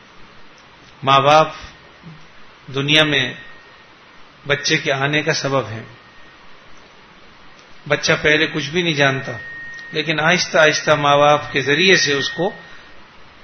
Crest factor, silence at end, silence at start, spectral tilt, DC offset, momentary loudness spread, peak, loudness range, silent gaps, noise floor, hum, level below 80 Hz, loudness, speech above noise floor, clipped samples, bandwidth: 20 dB; 0.2 s; 0.2 s; -3.5 dB/octave; under 0.1%; 17 LU; 0 dBFS; 6 LU; none; -45 dBFS; none; -52 dBFS; -16 LUFS; 29 dB; under 0.1%; 11 kHz